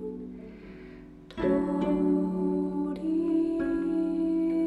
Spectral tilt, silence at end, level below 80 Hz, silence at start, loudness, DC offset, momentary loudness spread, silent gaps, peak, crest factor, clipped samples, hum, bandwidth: -9.5 dB/octave; 0 s; -52 dBFS; 0 s; -28 LUFS; under 0.1%; 19 LU; none; -16 dBFS; 14 dB; under 0.1%; none; 8.2 kHz